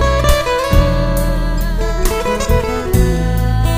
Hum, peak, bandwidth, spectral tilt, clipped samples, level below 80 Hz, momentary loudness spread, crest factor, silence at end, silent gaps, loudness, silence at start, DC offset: none; 0 dBFS; 16 kHz; -5.5 dB/octave; under 0.1%; -16 dBFS; 5 LU; 14 dB; 0 s; none; -16 LUFS; 0 s; under 0.1%